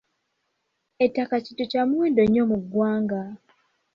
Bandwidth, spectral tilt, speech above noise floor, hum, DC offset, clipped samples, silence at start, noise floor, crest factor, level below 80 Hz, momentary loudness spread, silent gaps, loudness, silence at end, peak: 5.8 kHz; -8.5 dB/octave; 54 dB; none; under 0.1%; under 0.1%; 1 s; -76 dBFS; 16 dB; -58 dBFS; 8 LU; none; -23 LUFS; 0.6 s; -8 dBFS